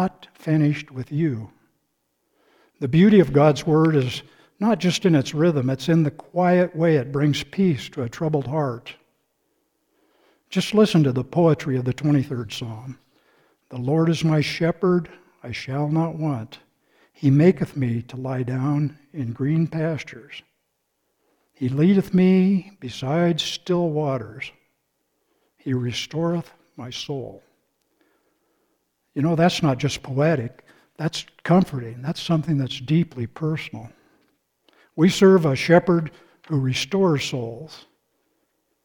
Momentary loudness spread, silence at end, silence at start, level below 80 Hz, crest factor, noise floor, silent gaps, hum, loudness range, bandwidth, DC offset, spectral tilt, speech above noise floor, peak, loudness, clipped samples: 17 LU; 1.1 s; 0 s; -56 dBFS; 20 dB; -74 dBFS; none; none; 7 LU; 16.5 kHz; under 0.1%; -7 dB/octave; 53 dB; -2 dBFS; -21 LUFS; under 0.1%